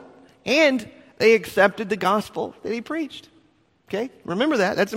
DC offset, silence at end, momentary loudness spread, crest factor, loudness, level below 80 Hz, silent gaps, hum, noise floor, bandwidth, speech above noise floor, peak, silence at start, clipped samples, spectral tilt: under 0.1%; 0 s; 14 LU; 20 dB; -22 LUFS; -62 dBFS; none; none; -61 dBFS; 16 kHz; 39 dB; -4 dBFS; 0 s; under 0.1%; -4.5 dB/octave